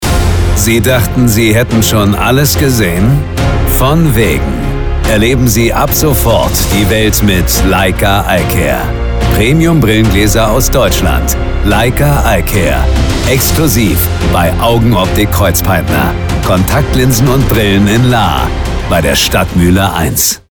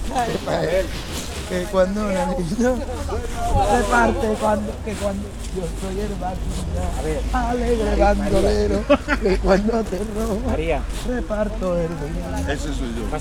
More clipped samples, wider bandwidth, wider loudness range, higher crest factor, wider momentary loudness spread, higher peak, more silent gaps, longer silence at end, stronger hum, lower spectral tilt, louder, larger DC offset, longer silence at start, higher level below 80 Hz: neither; first, over 20 kHz vs 16.5 kHz; second, 1 LU vs 5 LU; second, 8 dB vs 18 dB; second, 4 LU vs 9 LU; first, 0 dBFS vs -4 dBFS; neither; first, 0.15 s vs 0 s; neither; about the same, -5 dB/octave vs -5.5 dB/octave; first, -9 LUFS vs -22 LUFS; neither; about the same, 0 s vs 0 s; first, -16 dBFS vs -28 dBFS